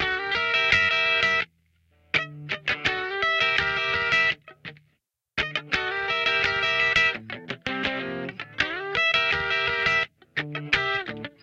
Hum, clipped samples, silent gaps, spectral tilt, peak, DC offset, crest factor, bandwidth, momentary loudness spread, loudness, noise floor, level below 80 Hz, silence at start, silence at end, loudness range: none; under 0.1%; none; -3 dB/octave; -4 dBFS; under 0.1%; 22 dB; 8.8 kHz; 13 LU; -23 LUFS; -72 dBFS; -52 dBFS; 0 s; 0.15 s; 1 LU